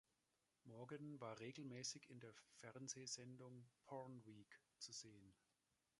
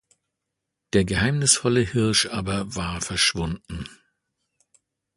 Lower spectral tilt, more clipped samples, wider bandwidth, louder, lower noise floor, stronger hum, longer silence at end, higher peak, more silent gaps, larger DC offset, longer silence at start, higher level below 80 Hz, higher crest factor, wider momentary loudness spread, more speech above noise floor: about the same, -3.5 dB/octave vs -3.5 dB/octave; neither; about the same, 11.5 kHz vs 11.5 kHz; second, -56 LUFS vs -22 LUFS; first, -89 dBFS vs -82 dBFS; neither; second, 0.65 s vs 1.25 s; second, -38 dBFS vs -4 dBFS; neither; neither; second, 0.65 s vs 0.95 s; second, under -90 dBFS vs -44 dBFS; about the same, 22 dB vs 22 dB; about the same, 13 LU vs 14 LU; second, 31 dB vs 59 dB